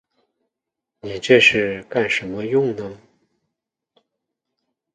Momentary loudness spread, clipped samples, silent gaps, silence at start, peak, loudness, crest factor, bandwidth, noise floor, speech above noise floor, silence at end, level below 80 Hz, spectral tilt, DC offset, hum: 20 LU; under 0.1%; none; 1.05 s; 0 dBFS; -18 LUFS; 22 dB; 9.6 kHz; -83 dBFS; 65 dB; 2 s; -58 dBFS; -4.5 dB/octave; under 0.1%; none